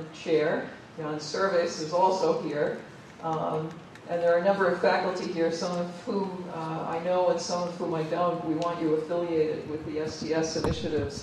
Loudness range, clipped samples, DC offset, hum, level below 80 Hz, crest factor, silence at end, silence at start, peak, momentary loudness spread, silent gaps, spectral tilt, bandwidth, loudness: 2 LU; under 0.1%; under 0.1%; none; -54 dBFS; 18 dB; 0 s; 0 s; -10 dBFS; 10 LU; none; -5.5 dB/octave; 11 kHz; -28 LUFS